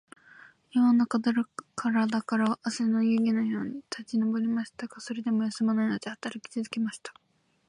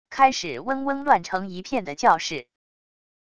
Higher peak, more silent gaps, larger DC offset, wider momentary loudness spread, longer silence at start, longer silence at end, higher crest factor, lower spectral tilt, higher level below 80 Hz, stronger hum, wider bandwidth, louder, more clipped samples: second, -16 dBFS vs -4 dBFS; neither; second, under 0.1% vs 0.4%; about the same, 12 LU vs 10 LU; first, 0.75 s vs 0.05 s; about the same, 0.55 s vs 0.65 s; second, 12 dB vs 20 dB; first, -5.5 dB/octave vs -3.5 dB/octave; second, -76 dBFS vs -60 dBFS; neither; about the same, 10.5 kHz vs 10 kHz; second, -28 LUFS vs -23 LUFS; neither